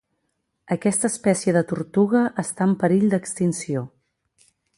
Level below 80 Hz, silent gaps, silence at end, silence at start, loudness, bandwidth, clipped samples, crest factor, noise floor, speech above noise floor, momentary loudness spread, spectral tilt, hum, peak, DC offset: -64 dBFS; none; 0.9 s; 0.7 s; -22 LUFS; 11.5 kHz; under 0.1%; 18 dB; -74 dBFS; 54 dB; 9 LU; -6 dB/octave; none; -6 dBFS; under 0.1%